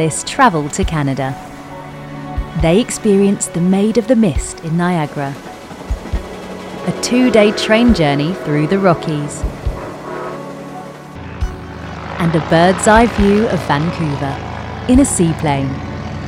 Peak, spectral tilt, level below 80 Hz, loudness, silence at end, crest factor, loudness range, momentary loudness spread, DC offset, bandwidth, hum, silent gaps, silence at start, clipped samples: 0 dBFS; -5.5 dB/octave; -30 dBFS; -15 LUFS; 0 s; 16 dB; 6 LU; 18 LU; under 0.1%; 15 kHz; none; none; 0 s; under 0.1%